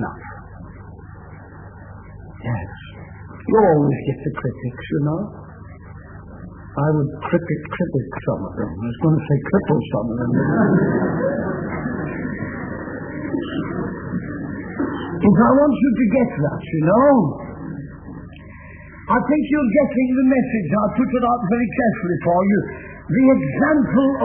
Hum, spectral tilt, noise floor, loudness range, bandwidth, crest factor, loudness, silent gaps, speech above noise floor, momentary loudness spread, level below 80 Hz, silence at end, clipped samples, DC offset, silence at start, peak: none; -12.5 dB/octave; -38 dBFS; 8 LU; 3.4 kHz; 18 dB; -19 LUFS; none; 21 dB; 23 LU; -44 dBFS; 0 s; under 0.1%; under 0.1%; 0 s; -2 dBFS